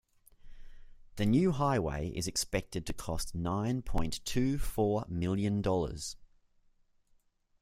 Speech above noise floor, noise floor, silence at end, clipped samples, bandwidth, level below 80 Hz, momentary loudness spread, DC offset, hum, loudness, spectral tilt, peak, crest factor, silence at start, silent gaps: 38 dB; -70 dBFS; 1.35 s; under 0.1%; 16 kHz; -44 dBFS; 10 LU; under 0.1%; none; -33 LUFS; -5.5 dB/octave; -16 dBFS; 18 dB; 0.45 s; none